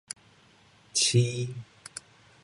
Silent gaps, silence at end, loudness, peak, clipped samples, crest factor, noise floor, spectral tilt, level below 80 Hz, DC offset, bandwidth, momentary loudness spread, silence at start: none; 0.45 s; -26 LUFS; -12 dBFS; under 0.1%; 20 dB; -59 dBFS; -3.5 dB/octave; -68 dBFS; under 0.1%; 11.5 kHz; 20 LU; 0.95 s